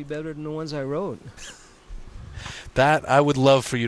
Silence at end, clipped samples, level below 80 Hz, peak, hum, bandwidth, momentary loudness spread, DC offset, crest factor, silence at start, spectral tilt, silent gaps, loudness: 0 s; under 0.1%; -44 dBFS; -4 dBFS; none; 11 kHz; 23 LU; under 0.1%; 20 dB; 0 s; -5.5 dB/octave; none; -22 LUFS